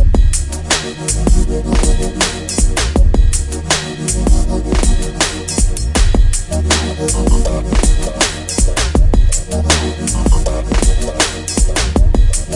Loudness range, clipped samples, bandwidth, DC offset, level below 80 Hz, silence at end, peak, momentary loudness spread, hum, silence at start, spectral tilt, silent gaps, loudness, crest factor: 1 LU; under 0.1%; 11.5 kHz; under 0.1%; -14 dBFS; 0 s; 0 dBFS; 3 LU; none; 0 s; -4 dB/octave; none; -15 LUFS; 12 dB